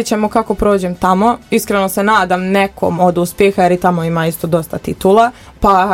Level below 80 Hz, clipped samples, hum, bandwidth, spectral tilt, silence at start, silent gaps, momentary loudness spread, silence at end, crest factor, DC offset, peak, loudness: -36 dBFS; under 0.1%; none; 17 kHz; -5.5 dB/octave; 0 s; none; 5 LU; 0 s; 12 dB; under 0.1%; 0 dBFS; -13 LUFS